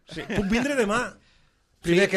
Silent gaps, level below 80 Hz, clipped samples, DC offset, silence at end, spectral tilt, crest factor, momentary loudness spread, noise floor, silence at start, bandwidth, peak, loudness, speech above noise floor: none; -46 dBFS; under 0.1%; under 0.1%; 0 s; -5 dB/octave; 16 dB; 10 LU; -62 dBFS; 0.1 s; 14 kHz; -10 dBFS; -25 LUFS; 39 dB